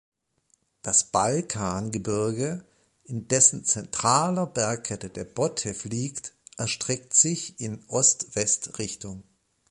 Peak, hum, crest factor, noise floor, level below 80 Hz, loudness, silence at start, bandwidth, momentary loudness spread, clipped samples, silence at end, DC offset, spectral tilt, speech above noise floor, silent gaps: -4 dBFS; none; 22 dB; -69 dBFS; -58 dBFS; -24 LUFS; 0.85 s; 11.5 kHz; 16 LU; under 0.1%; 0.5 s; under 0.1%; -3 dB/octave; 43 dB; none